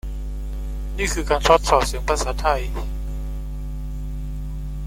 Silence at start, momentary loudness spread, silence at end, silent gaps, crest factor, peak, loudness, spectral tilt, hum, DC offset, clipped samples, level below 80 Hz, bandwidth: 0.05 s; 15 LU; 0 s; none; 20 dB; -2 dBFS; -23 LUFS; -4 dB/octave; none; under 0.1%; under 0.1%; -26 dBFS; 16 kHz